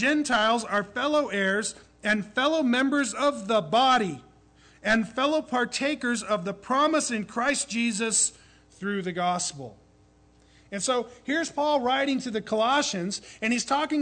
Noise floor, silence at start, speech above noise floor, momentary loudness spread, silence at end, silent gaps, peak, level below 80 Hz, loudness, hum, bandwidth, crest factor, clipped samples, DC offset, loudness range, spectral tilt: -59 dBFS; 0 s; 33 dB; 8 LU; 0 s; none; -12 dBFS; -62 dBFS; -26 LUFS; none; 9.4 kHz; 14 dB; under 0.1%; under 0.1%; 4 LU; -3 dB/octave